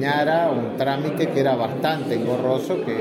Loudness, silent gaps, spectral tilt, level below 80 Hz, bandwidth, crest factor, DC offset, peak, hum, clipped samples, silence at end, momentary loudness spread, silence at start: -22 LUFS; none; -6.5 dB/octave; -64 dBFS; 16.5 kHz; 14 dB; under 0.1%; -8 dBFS; none; under 0.1%; 0 s; 4 LU; 0 s